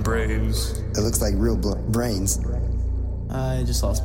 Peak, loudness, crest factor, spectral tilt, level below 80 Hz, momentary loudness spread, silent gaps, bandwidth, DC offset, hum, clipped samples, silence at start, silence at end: -8 dBFS; -24 LUFS; 14 dB; -5 dB/octave; -26 dBFS; 5 LU; none; 16.5 kHz; under 0.1%; none; under 0.1%; 0 s; 0 s